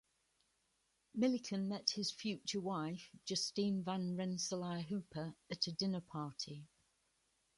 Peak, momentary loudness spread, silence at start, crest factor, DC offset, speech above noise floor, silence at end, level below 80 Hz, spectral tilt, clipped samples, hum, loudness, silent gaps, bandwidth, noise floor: -18 dBFS; 10 LU; 1.15 s; 24 dB; under 0.1%; 40 dB; 0.9 s; -78 dBFS; -4.5 dB/octave; under 0.1%; none; -41 LUFS; none; 11.5 kHz; -81 dBFS